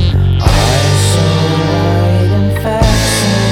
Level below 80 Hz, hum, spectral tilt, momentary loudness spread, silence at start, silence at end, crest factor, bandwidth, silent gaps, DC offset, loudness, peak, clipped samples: -20 dBFS; 50 Hz at -30 dBFS; -5 dB/octave; 2 LU; 0 s; 0 s; 10 dB; 16 kHz; none; under 0.1%; -11 LUFS; 0 dBFS; under 0.1%